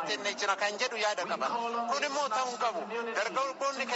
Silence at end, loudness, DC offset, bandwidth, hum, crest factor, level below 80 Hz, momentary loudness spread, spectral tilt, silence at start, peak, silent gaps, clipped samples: 0 s; -31 LUFS; under 0.1%; 8 kHz; none; 16 dB; -82 dBFS; 3 LU; 0.5 dB/octave; 0 s; -16 dBFS; none; under 0.1%